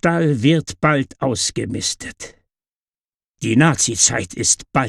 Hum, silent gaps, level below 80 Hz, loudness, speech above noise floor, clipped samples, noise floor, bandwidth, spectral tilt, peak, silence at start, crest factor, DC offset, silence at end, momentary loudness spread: none; 2.76-2.88 s, 3.00-3.09 s, 3.16-3.20 s, 3.29-3.34 s; -48 dBFS; -17 LUFS; over 72 dB; under 0.1%; under -90 dBFS; 13 kHz; -3.5 dB/octave; -2 dBFS; 0.05 s; 16 dB; under 0.1%; 0 s; 14 LU